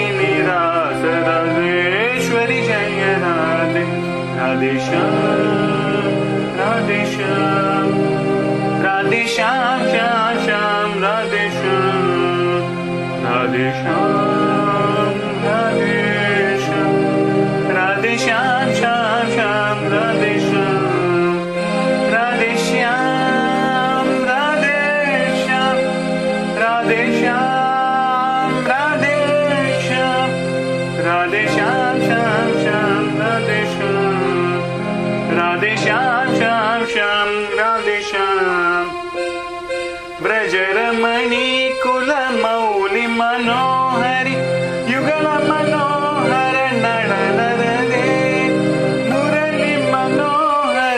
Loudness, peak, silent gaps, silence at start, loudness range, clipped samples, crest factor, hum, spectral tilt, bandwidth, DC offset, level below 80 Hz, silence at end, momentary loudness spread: -16 LUFS; -2 dBFS; none; 0 s; 1 LU; under 0.1%; 16 dB; none; -5.5 dB/octave; 12.5 kHz; under 0.1%; -52 dBFS; 0 s; 3 LU